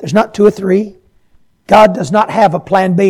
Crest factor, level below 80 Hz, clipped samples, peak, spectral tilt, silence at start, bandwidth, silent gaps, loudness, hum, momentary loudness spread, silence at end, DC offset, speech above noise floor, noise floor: 12 dB; -46 dBFS; 1%; 0 dBFS; -6.5 dB/octave; 0 s; 14 kHz; none; -11 LUFS; none; 6 LU; 0 s; under 0.1%; 39 dB; -49 dBFS